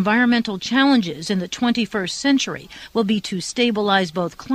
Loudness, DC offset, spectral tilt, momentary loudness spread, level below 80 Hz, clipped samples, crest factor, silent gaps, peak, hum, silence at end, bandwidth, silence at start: -20 LUFS; under 0.1%; -4.5 dB/octave; 9 LU; -56 dBFS; under 0.1%; 16 dB; none; -4 dBFS; none; 0 s; 13 kHz; 0 s